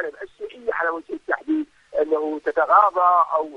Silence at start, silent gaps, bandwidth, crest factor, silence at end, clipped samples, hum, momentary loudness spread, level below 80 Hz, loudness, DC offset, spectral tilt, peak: 0 s; none; 8.2 kHz; 20 dB; 0 s; under 0.1%; none; 15 LU; -64 dBFS; -21 LUFS; under 0.1%; -5 dB/octave; -2 dBFS